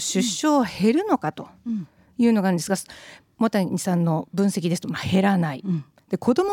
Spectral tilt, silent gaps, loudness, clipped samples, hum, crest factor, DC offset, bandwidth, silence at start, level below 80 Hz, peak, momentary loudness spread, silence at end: -5.5 dB/octave; none; -23 LUFS; under 0.1%; none; 14 dB; under 0.1%; 17 kHz; 0 s; -60 dBFS; -8 dBFS; 11 LU; 0 s